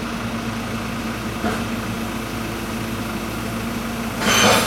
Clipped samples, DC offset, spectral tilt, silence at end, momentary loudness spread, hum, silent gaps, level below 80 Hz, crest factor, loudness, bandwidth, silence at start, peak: under 0.1%; under 0.1%; -3.5 dB/octave; 0 s; 8 LU; none; none; -38 dBFS; 22 dB; -23 LUFS; 16.5 kHz; 0 s; 0 dBFS